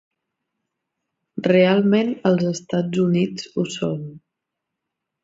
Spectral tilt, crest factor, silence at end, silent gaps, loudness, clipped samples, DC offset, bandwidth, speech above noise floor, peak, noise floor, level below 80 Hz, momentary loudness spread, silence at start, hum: -6.5 dB/octave; 18 dB; 1.05 s; none; -20 LUFS; under 0.1%; under 0.1%; 7.8 kHz; 63 dB; -4 dBFS; -82 dBFS; -64 dBFS; 11 LU; 1.35 s; none